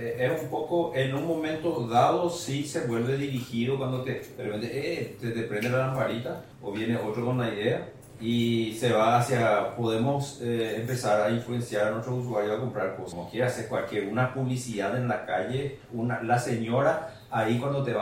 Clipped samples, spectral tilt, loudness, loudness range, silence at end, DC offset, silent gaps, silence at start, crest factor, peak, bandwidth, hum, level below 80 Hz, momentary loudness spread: under 0.1%; -6 dB/octave; -28 LUFS; 4 LU; 0 s; under 0.1%; none; 0 s; 18 dB; -10 dBFS; 16.5 kHz; none; -62 dBFS; 9 LU